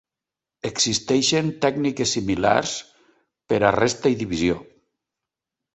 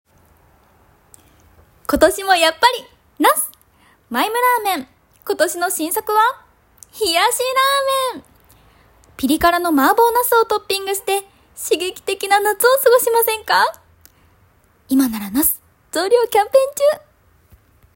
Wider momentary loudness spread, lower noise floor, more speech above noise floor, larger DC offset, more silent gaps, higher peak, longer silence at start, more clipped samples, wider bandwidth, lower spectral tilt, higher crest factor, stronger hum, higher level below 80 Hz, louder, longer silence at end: about the same, 10 LU vs 11 LU; first, -88 dBFS vs -55 dBFS; first, 67 dB vs 39 dB; neither; neither; about the same, -2 dBFS vs 0 dBFS; second, 0.65 s vs 1.9 s; neither; second, 8.4 kHz vs 17 kHz; first, -3.5 dB/octave vs -2 dB/octave; about the same, 20 dB vs 18 dB; neither; about the same, -50 dBFS vs -48 dBFS; second, -21 LUFS vs -16 LUFS; about the same, 1.1 s vs 1 s